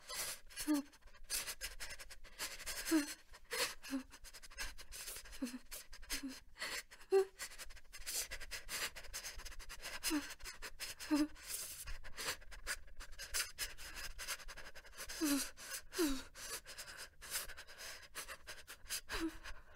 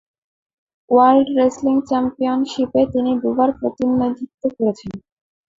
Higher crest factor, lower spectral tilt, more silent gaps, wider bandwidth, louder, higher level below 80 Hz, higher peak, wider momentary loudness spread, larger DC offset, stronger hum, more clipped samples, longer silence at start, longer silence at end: first, 22 dB vs 16 dB; second, -2 dB/octave vs -6.5 dB/octave; second, none vs 4.34-4.38 s; first, 16 kHz vs 7.6 kHz; second, -43 LUFS vs -18 LUFS; about the same, -56 dBFS vs -54 dBFS; second, -24 dBFS vs -2 dBFS; first, 14 LU vs 11 LU; neither; neither; neither; second, 0 s vs 0.9 s; second, 0 s vs 0.6 s